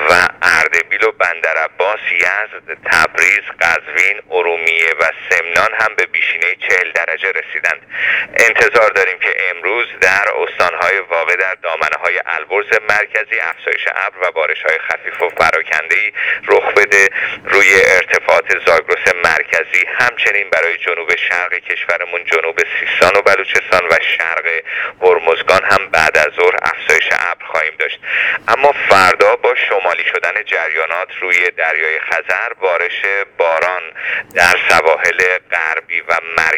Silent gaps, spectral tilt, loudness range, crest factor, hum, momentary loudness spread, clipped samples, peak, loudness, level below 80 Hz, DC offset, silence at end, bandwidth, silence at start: none; -2 dB/octave; 4 LU; 14 dB; none; 7 LU; 0.2%; 0 dBFS; -13 LUFS; -52 dBFS; under 0.1%; 0 s; over 20 kHz; 0 s